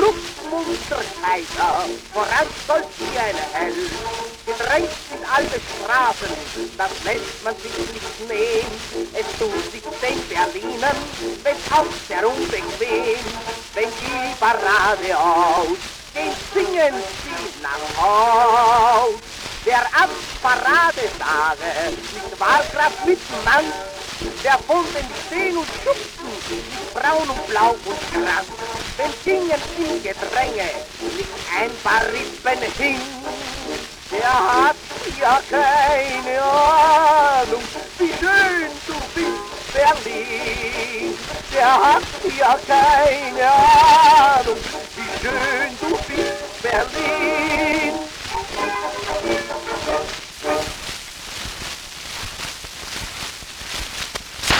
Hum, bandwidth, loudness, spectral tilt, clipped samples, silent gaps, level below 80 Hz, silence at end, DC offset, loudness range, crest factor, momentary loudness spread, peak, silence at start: none; over 20 kHz; -19 LUFS; -2.5 dB/octave; under 0.1%; none; -42 dBFS; 0 s; under 0.1%; 9 LU; 18 dB; 14 LU; 0 dBFS; 0 s